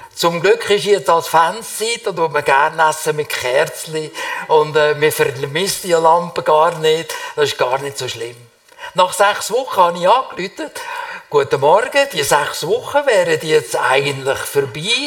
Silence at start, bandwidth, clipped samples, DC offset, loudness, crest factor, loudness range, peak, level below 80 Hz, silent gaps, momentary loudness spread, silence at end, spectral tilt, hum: 0 s; 18 kHz; under 0.1%; under 0.1%; -16 LUFS; 16 dB; 2 LU; 0 dBFS; -58 dBFS; none; 11 LU; 0 s; -3 dB/octave; none